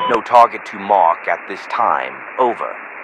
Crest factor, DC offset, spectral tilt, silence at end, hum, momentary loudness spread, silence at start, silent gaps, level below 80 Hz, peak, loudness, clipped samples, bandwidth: 16 dB; under 0.1%; -4.5 dB/octave; 0 s; none; 13 LU; 0 s; none; -62 dBFS; 0 dBFS; -16 LUFS; 0.3%; 11.5 kHz